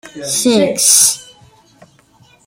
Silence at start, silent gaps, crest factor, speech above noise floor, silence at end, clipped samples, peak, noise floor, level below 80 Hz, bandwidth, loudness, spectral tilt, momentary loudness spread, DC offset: 0.05 s; none; 16 dB; 37 dB; 1.25 s; under 0.1%; 0 dBFS; -49 dBFS; -58 dBFS; over 20 kHz; -10 LUFS; -1.5 dB/octave; 11 LU; under 0.1%